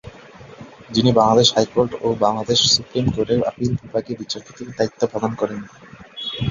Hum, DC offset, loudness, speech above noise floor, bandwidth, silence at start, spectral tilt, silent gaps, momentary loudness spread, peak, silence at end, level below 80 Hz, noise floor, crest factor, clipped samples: none; under 0.1%; -19 LUFS; 22 dB; 7.6 kHz; 0.05 s; -4.5 dB/octave; none; 15 LU; -2 dBFS; 0 s; -46 dBFS; -42 dBFS; 18 dB; under 0.1%